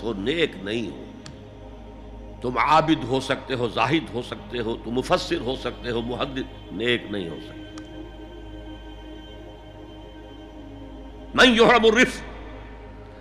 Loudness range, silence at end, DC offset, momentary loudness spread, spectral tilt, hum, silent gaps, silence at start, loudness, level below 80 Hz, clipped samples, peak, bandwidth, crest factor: 19 LU; 0 s; under 0.1%; 25 LU; -4.5 dB/octave; none; none; 0 s; -22 LUFS; -44 dBFS; under 0.1%; -4 dBFS; 13.5 kHz; 20 dB